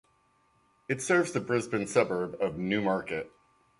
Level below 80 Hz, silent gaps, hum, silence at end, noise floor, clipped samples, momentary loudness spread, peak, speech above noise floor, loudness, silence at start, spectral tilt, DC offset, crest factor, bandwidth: -64 dBFS; none; none; 0.5 s; -68 dBFS; under 0.1%; 10 LU; -10 dBFS; 39 dB; -29 LUFS; 0.9 s; -5 dB/octave; under 0.1%; 22 dB; 11.5 kHz